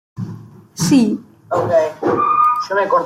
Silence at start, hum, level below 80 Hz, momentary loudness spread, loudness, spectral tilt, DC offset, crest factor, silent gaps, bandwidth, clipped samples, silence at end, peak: 0.15 s; none; -56 dBFS; 17 LU; -16 LUFS; -5.5 dB/octave; under 0.1%; 14 dB; none; 16 kHz; under 0.1%; 0 s; -2 dBFS